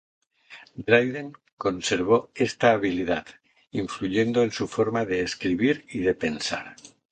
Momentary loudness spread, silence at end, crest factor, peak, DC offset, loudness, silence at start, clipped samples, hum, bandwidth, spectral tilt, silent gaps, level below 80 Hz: 13 LU; 0.25 s; 22 dB; -2 dBFS; under 0.1%; -25 LUFS; 0.5 s; under 0.1%; none; 9.4 kHz; -5 dB/octave; 1.52-1.57 s; -56 dBFS